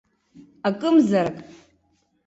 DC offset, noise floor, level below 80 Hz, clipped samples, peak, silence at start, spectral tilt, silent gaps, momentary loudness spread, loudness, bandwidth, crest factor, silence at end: under 0.1%; -67 dBFS; -64 dBFS; under 0.1%; -6 dBFS; 0.65 s; -7 dB/octave; none; 11 LU; -21 LUFS; 8 kHz; 16 dB; 0.85 s